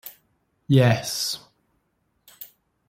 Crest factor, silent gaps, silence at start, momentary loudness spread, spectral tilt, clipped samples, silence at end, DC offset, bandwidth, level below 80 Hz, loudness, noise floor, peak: 22 dB; none; 0.05 s; 24 LU; -5 dB/octave; under 0.1%; 0.45 s; under 0.1%; 16.5 kHz; -60 dBFS; -22 LUFS; -71 dBFS; -4 dBFS